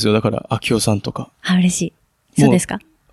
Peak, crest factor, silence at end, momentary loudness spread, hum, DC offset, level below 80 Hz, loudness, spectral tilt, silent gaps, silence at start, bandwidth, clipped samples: 0 dBFS; 18 dB; 0.35 s; 12 LU; none; under 0.1%; -48 dBFS; -18 LUFS; -5 dB/octave; none; 0 s; 13.5 kHz; under 0.1%